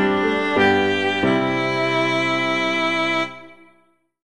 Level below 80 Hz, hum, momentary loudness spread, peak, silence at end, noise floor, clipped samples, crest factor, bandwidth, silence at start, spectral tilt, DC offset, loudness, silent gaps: -56 dBFS; none; 4 LU; -4 dBFS; 0.75 s; -60 dBFS; under 0.1%; 16 dB; 11.5 kHz; 0 s; -5 dB/octave; 0.5%; -19 LUFS; none